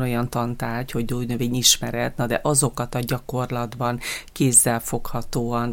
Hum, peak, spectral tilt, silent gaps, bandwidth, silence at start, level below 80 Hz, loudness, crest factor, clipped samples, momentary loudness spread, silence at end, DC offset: none; -2 dBFS; -3.5 dB/octave; none; 17 kHz; 0 s; -40 dBFS; -22 LUFS; 20 dB; under 0.1%; 12 LU; 0 s; under 0.1%